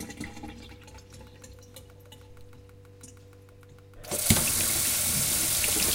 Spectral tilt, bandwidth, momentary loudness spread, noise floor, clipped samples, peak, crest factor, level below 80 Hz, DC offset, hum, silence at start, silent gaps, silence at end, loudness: -2 dB/octave; 17 kHz; 26 LU; -51 dBFS; under 0.1%; -2 dBFS; 30 dB; -48 dBFS; under 0.1%; none; 0 s; none; 0 s; -24 LUFS